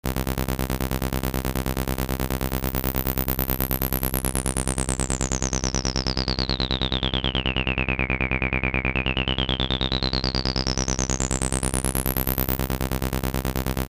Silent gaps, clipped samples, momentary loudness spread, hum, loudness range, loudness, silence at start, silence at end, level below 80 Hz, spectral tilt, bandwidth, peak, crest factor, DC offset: none; under 0.1%; 3 LU; none; 2 LU; -24 LUFS; 0.05 s; 0.05 s; -30 dBFS; -3.5 dB/octave; 16 kHz; -4 dBFS; 22 dB; under 0.1%